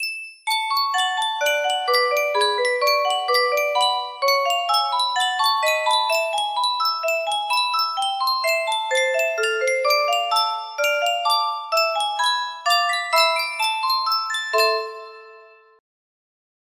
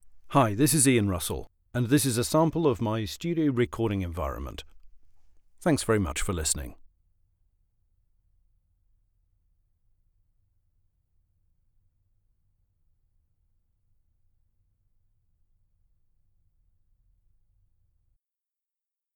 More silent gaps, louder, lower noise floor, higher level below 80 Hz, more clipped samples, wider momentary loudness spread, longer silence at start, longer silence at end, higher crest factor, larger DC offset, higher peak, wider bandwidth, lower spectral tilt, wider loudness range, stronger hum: neither; first, -20 LUFS vs -26 LUFS; second, -48 dBFS vs -90 dBFS; second, -76 dBFS vs -48 dBFS; neither; second, 3 LU vs 12 LU; about the same, 0 s vs 0.05 s; second, 1.35 s vs 12.4 s; second, 16 dB vs 24 dB; neither; about the same, -6 dBFS vs -8 dBFS; second, 16 kHz vs over 20 kHz; second, 2.5 dB/octave vs -5 dB/octave; second, 1 LU vs 8 LU; neither